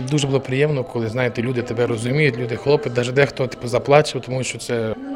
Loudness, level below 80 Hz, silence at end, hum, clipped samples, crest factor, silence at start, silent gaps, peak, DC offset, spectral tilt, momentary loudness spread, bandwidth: -20 LUFS; -52 dBFS; 0 s; none; under 0.1%; 20 dB; 0 s; none; 0 dBFS; under 0.1%; -5.5 dB/octave; 8 LU; 13 kHz